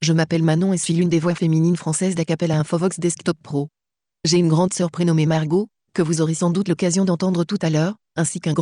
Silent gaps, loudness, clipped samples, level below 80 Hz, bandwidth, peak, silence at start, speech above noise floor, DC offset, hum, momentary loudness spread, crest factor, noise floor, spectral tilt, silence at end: none; -20 LUFS; under 0.1%; -60 dBFS; 11 kHz; -6 dBFS; 0 s; 24 dB; under 0.1%; none; 6 LU; 12 dB; -43 dBFS; -5.5 dB/octave; 0 s